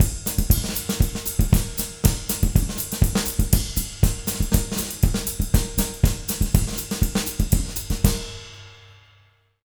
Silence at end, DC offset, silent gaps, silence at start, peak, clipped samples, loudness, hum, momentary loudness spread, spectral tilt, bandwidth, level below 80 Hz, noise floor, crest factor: 0.75 s; under 0.1%; none; 0 s; 0 dBFS; under 0.1%; -23 LUFS; none; 5 LU; -4.5 dB/octave; over 20 kHz; -26 dBFS; -58 dBFS; 22 dB